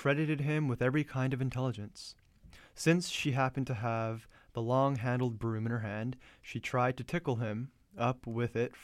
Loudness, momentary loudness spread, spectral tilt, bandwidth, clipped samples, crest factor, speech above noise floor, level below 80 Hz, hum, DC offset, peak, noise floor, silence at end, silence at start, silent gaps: -34 LUFS; 13 LU; -6.5 dB/octave; 13.5 kHz; under 0.1%; 20 dB; 25 dB; -62 dBFS; none; under 0.1%; -12 dBFS; -58 dBFS; 0 s; 0 s; none